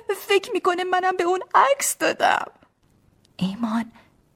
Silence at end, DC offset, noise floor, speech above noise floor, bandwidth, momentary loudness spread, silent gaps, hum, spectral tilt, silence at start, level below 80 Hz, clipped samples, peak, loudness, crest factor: 0.45 s; under 0.1%; -61 dBFS; 39 dB; 17 kHz; 10 LU; none; none; -3 dB/octave; 0.1 s; -66 dBFS; under 0.1%; -4 dBFS; -22 LUFS; 20 dB